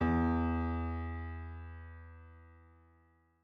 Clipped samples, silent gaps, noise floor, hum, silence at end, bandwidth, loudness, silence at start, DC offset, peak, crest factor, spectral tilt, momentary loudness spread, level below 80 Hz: under 0.1%; none; -69 dBFS; none; 0.8 s; 5 kHz; -36 LUFS; 0 s; under 0.1%; -20 dBFS; 18 dB; -10 dB/octave; 23 LU; -50 dBFS